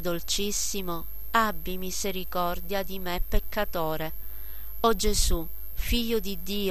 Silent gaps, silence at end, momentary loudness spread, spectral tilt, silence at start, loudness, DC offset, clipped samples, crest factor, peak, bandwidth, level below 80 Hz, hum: none; 0 s; 11 LU; -3 dB/octave; 0 s; -29 LUFS; 3%; under 0.1%; 20 dB; -8 dBFS; 14 kHz; -34 dBFS; none